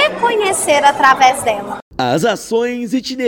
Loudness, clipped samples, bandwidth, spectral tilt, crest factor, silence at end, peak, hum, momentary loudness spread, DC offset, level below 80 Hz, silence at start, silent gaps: -14 LUFS; 0.2%; 17.5 kHz; -3 dB/octave; 14 dB; 0 s; 0 dBFS; none; 10 LU; under 0.1%; -50 dBFS; 0 s; 1.82-1.91 s